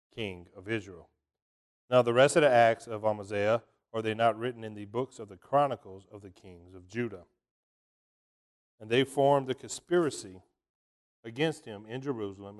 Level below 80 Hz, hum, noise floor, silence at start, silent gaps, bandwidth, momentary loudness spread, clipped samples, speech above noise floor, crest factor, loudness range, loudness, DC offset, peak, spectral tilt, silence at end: -68 dBFS; none; under -90 dBFS; 0.15 s; 1.42-1.88 s, 7.51-8.78 s, 10.69-11.23 s; 12.5 kHz; 22 LU; under 0.1%; over 60 dB; 22 dB; 9 LU; -29 LUFS; under 0.1%; -10 dBFS; -5 dB/octave; 0 s